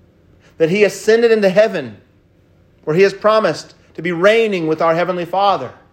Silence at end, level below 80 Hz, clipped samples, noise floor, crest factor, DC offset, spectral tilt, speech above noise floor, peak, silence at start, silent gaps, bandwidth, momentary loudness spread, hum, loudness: 0.2 s; -60 dBFS; under 0.1%; -52 dBFS; 16 dB; under 0.1%; -5.5 dB/octave; 38 dB; 0 dBFS; 0.6 s; none; 16 kHz; 13 LU; none; -15 LUFS